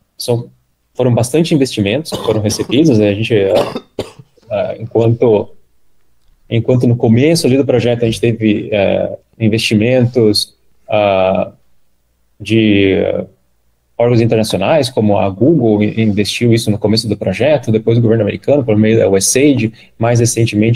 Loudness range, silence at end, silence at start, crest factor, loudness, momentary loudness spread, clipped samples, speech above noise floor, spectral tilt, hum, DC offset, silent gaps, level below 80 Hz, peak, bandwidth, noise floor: 3 LU; 0 s; 0.2 s; 12 dB; -13 LUFS; 9 LU; under 0.1%; 48 dB; -5.5 dB/octave; none; under 0.1%; none; -46 dBFS; 0 dBFS; 15.5 kHz; -59 dBFS